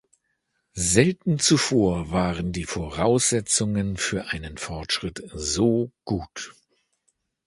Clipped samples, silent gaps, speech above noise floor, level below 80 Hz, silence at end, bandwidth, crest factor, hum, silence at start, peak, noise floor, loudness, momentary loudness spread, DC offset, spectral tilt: under 0.1%; none; 51 dB; -44 dBFS; 0.95 s; 11.5 kHz; 24 dB; none; 0.75 s; -2 dBFS; -75 dBFS; -23 LUFS; 14 LU; under 0.1%; -4 dB/octave